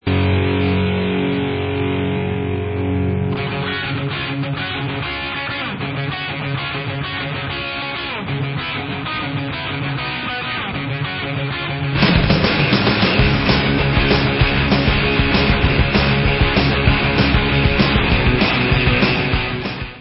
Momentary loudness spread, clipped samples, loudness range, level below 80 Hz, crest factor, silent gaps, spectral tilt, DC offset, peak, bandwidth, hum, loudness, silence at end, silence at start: 8 LU; under 0.1%; 8 LU; -26 dBFS; 18 dB; none; -10 dB/octave; under 0.1%; 0 dBFS; 5.8 kHz; none; -18 LUFS; 0 s; 0.05 s